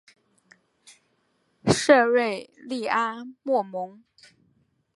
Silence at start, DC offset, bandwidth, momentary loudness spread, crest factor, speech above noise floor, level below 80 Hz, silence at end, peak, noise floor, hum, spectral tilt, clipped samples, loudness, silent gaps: 1.65 s; under 0.1%; 11.5 kHz; 17 LU; 24 dB; 46 dB; -62 dBFS; 1.05 s; -4 dBFS; -70 dBFS; none; -4.5 dB/octave; under 0.1%; -24 LUFS; none